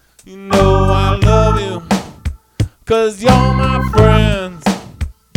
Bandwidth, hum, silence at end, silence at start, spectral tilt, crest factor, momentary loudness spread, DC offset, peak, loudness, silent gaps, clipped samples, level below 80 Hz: 16 kHz; none; 0.25 s; 0.3 s; -6.5 dB/octave; 14 dB; 16 LU; under 0.1%; 0 dBFS; -14 LUFS; none; 0.2%; -22 dBFS